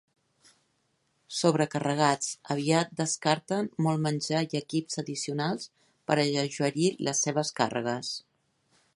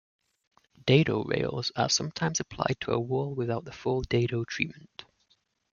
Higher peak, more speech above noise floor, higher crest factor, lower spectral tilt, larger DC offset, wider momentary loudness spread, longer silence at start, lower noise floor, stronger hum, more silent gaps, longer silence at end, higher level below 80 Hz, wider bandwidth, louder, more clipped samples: about the same, -8 dBFS vs -8 dBFS; about the same, 45 dB vs 42 dB; about the same, 22 dB vs 22 dB; about the same, -4.5 dB/octave vs -4.5 dB/octave; neither; about the same, 8 LU vs 9 LU; first, 1.3 s vs 0.85 s; about the same, -74 dBFS vs -71 dBFS; neither; neither; about the same, 0.75 s vs 0.7 s; second, -72 dBFS vs -56 dBFS; first, 11.5 kHz vs 7.4 kHz; about the same, -28 LUFS vs -29 LUFS; neither